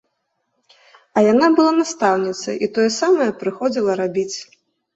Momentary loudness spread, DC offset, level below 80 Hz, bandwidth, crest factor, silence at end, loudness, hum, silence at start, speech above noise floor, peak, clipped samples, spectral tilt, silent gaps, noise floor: 10 LU; under 0.1%; -64 dBFS; 8.2 kHz; 16 dB; 0.5 s; -18 LUFS; none; 1.15 s; 55 dB; -2 dBFS; under 0.1%; -4.5 dB/octave; none; -72 dBFS